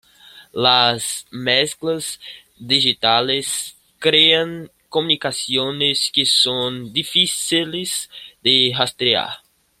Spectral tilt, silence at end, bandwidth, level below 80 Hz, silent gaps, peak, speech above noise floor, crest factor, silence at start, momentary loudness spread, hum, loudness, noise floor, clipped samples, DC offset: -2 dB/octave; 0.45 s; 16 kHz; -62 dBFS; none; 0 dBFS; 27 dB; 20 dB; 0.35 s; 15 LU; none; -17 LUFS; -46 dBFS; under 0.1%; under 0.1%